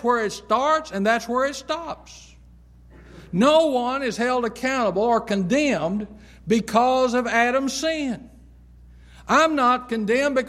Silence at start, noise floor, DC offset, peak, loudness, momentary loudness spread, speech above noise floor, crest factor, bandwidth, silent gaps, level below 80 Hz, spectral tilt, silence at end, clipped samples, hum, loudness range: 0 s; -49 dBFS; under 0.1%; -4 dBFS; -21 LUFS; 11 LU; 27 dB; 18 dB; 15 kHz; none; -50 dBFS; -4.5 dB/octave; 0 s; under 0.1%; 60 Hz at -50 dBFS; 2 LU